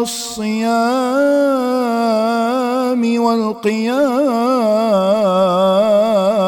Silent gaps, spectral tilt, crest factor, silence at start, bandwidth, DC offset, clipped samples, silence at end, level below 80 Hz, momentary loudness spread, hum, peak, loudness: none; -5 dB/octave; 12 dB; 0 s; 18 kHz; under 0.1%; under 0.1%; 0 s; -64 dBFS; 4 LU; none; -4 dBFS; -15 LUFS